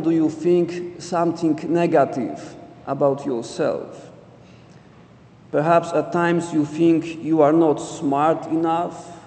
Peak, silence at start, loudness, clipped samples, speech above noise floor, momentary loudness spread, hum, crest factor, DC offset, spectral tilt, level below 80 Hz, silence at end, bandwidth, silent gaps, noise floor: -4 dBFS; 0 s; -20 LUFS; under 0.1%; 28 dB; 12 LU; none; 18 dB; under 0.1%; -7 dB/octave; -62 dBFS; 0 s; 9 kHz; none; -48 dBFS